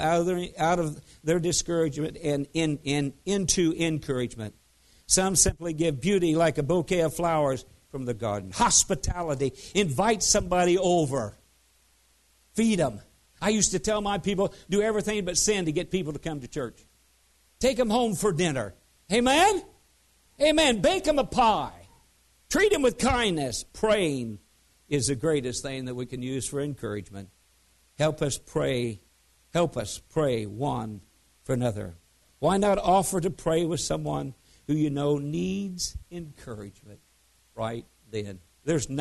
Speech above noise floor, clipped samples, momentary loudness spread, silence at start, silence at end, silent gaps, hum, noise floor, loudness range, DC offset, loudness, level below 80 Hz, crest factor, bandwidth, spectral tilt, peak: 38 dB; under 0.1%; 14 LU; 0 s; 0 s; none; none; -64 dBFS; 7 LU; under 0.1%; -26 LUFS; -48 dBFS; 22 dB; 12.5 kHz; -4 dB/octave; -6 dBFS